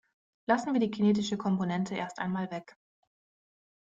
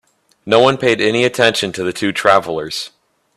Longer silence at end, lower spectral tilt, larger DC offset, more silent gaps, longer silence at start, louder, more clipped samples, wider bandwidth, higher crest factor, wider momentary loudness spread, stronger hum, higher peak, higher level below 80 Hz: first, 1.25 s vs 0.5 s; first, -6.5 dB/octave vs -4 dB/octave; neither; neither; about the same, 0.5 s vs 0.45 s; second, -30 LUFS vs -15 LUFS; neither; second, 7.8 kHz vs 13.5 kHz; about the same, 20 dB vs 16 dB; about the same, 10 LU vs 10 LU; neither; second, -10 dBFS vs 0 dBFS; second, -72 dBFS vs -54 dBFS